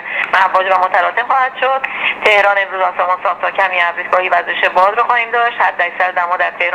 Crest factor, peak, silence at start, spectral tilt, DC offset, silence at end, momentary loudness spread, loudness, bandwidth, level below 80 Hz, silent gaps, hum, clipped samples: 14 dB; 0 dBFS; 0 s; -2.5 dB/octave; under 0.1%; 0 s; 5 LU; -13 LUFS; 12.5 kHz; -58 dBFS; none; 50 Hz at -50 dBFS; under 0.1%